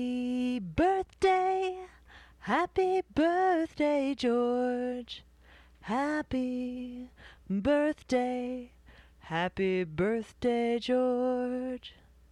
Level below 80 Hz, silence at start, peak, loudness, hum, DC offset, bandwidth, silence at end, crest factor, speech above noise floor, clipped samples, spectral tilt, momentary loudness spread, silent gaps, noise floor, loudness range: -56 dBFS; 0 s; -16 dBFS; -30 LUFS; none; under 0.1%; 11 kHz; 0.4 s; 14 dB; 27 dB; under 0.1%; -6 dB/octave; 15 LU; none; -57 dBFS; 4 LU